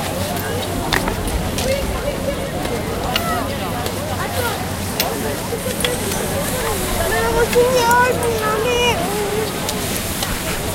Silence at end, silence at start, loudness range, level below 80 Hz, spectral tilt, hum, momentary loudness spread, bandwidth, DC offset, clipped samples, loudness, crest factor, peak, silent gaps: 0 s; 0 s; 4 LU; -32 dBFS; -3.5 dB/octave; none; 8 LU; 17 kHz; under 0.1%; under 0.1%; -19 LUFS; 20 dB; 0 dBFS; none